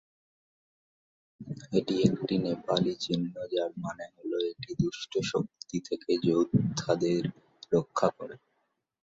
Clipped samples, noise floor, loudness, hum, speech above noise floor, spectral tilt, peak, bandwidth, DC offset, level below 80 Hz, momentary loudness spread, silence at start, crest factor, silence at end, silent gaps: under 0.1%; -78 dBFS; -30 LUFS; none; 48 dB; -6 dB/octave; -10 dBFS; 7.8 kHz; under 0.1%; -64 dBFS; 12 LU; 1.4 s; 22 dB; 0.8 s; none